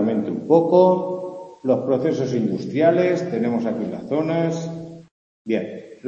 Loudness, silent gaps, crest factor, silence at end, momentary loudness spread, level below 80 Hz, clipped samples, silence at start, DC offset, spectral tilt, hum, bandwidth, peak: -21 LUFS; 5.11-5.45 s; 18 dB; 0 s; 16 LU; -66 dBFS; under 0.1%; 0 s; under 0.1%; -8 dB/octave; none; 7.6 kHz; -2 dBFS